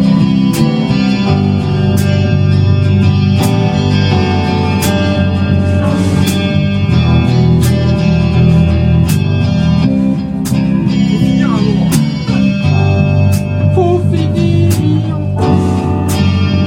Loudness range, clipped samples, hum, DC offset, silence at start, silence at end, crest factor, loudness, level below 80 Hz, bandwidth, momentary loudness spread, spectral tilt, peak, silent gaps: 1 LU; under 0.1%; none; under 0.1%; 0 s; 0 s; 10 dB; -11 LUFS; -28 dBFS; 16.5 kHz; 3 LU; -7 dB/octave; 0 dBFS; none